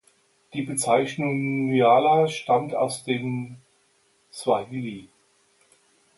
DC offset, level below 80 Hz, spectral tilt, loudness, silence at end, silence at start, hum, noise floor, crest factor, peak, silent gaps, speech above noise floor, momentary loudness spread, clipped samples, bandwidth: under 0.1%; -70 dBFS; -5 dB/octave; -23 LUFS; 1.15 s; 0.55 s; none; -65 dBFS; 20 dB; -6 dBFS; none; 42 dB; 17 LU; under 0.1%; 12 kHz